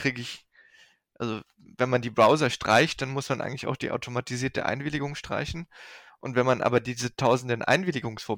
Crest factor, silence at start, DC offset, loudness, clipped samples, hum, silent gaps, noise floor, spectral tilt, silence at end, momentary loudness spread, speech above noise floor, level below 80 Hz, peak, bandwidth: 18 dB; 0 s; under 0.1%; -26 LUFS; under 0.1%; none; none; -59 dBFS; -5 dB/octave; 0 s; 16 LU; 33 dB; -56 dBFS; -10 dBFS; 17.5 kHz